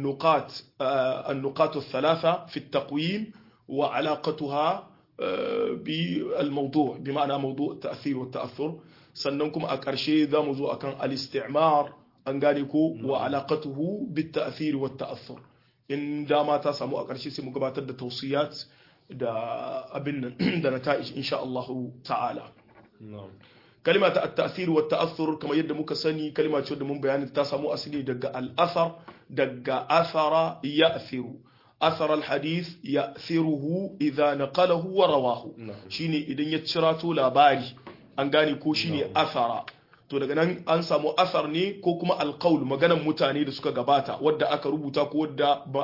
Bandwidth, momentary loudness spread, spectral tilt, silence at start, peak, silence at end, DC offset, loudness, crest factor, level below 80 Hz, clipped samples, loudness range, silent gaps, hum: 5.8 kHz; 11 LU; -6.5 dB/octave; 0 s; -6 dBFS; 0 s; under 0.1%; -27 LUFS; 20 dB; -70 dBFS; under 0.1%; 5 LU; none; none